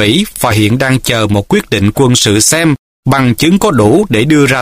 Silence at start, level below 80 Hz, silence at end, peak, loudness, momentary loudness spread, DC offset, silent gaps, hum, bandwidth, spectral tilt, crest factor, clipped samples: 0 s; -34 dBFS; 0 s; 0 dBFS; -9 LUFS; 5 LU; under 0.1%; 2.79-3.03 s; none; 16 kHz; -4.5 dB/octave; 10 dB; 0.2%